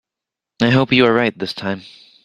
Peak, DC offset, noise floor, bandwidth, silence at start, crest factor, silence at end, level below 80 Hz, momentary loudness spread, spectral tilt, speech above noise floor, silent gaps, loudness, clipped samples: 0 dBFS; under 0.1%; -85 dBFS; 10.5 kHz; 0.6 s; 18 dB; 0.45 s; -52 dBFS; 12 LU; -6.5 dB/octave; 69 dB; none; -16 LUFS; under 0.1%